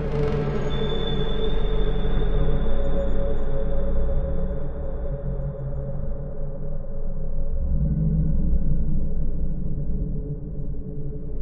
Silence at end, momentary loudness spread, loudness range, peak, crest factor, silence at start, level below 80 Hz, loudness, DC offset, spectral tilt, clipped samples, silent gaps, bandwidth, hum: 0 s; 9 LU; 4 LU; -8 dBFS; 12 dB; 0 s; -24 dBFS; -28 LUFS; under 0.1%; -9 dB/octave; under 0.1%; none; 3.9 kHz; none